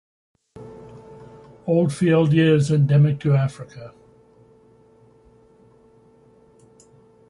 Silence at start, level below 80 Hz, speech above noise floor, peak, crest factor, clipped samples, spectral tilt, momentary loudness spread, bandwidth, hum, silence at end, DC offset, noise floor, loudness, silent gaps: 0.55 s; -58 dBFS; 36 dB; -6 dBFS; 18 dB; under 0.1%; -8 dB/octave; 26 LU; 11.5 kHz; none; 3.4 s; under 0.1%; -53 dBFS; -18 LUFS; none